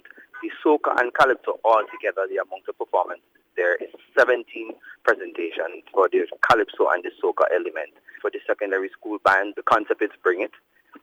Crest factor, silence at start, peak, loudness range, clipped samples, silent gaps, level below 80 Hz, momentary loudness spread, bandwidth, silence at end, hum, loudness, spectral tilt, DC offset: 18 dB; 0.35 s; -6 dBFS; 2 LU; under 0.1%; none; -66 dBFS; 13 LU; 15.5 kHz; 0.05 s; none; -23 LUFS; -4.5 dB/octave; under 0.1%